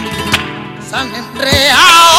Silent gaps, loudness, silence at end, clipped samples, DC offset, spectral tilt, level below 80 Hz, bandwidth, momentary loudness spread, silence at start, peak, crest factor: none; -9 LUFS; 0 s; 0.8%; under 0.1%; -2 dB/octave; -36 dBFS; over 20 kHz; 17 LU; 0 s; 0 dBFS; 10 dB